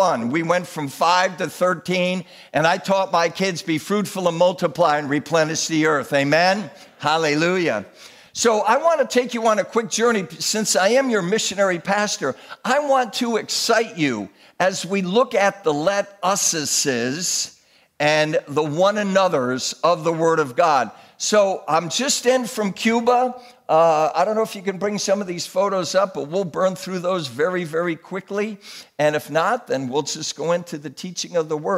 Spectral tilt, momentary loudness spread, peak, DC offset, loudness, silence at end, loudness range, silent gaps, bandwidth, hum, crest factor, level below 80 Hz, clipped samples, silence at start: -3.5 dB/octave; 8 LU; -4 dBFS; under 0.1%; -20 LUFS; 0 s; 4 LU; none; 16 kHz; none; 16 dB; -70 dBFS; under 0.1%; 0 s